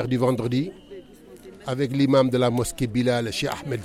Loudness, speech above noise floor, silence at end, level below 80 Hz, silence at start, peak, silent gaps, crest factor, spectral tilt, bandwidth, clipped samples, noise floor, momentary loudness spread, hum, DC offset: -23 LUFS; 23 dB; 0 s; -50 dBFS; 0 s; -8 dBFS; none; 16 dB; -6 dB/octave; 15.5 kHz; under 0.1%; -45 dBFS; 18 LU; none; under 0.1%